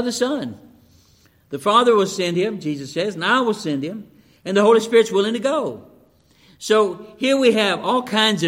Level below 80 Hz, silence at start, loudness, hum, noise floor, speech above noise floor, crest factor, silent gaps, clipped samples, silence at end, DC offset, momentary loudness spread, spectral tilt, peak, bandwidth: -66 dBFS; 0 s; -19 LUFS; none; -55 dBFS; 37 dB; 18 dB; none; under 0.1%; 0 s; under 0.1%; 15 LU; -4 dB/octave; -2 dBFS; 16 kHz